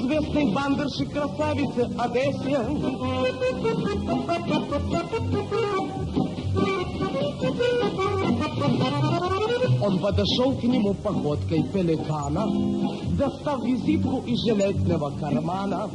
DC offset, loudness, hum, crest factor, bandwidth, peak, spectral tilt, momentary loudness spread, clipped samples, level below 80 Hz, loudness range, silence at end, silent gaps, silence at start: under 0.1%; -25 LUFS; none; 14 dB; 11 kHz; -10 dBFS; -7 dB/octave; 4 LU; under 0.1%; -48 dBFS; 3 LU; 0 s; none; 0 s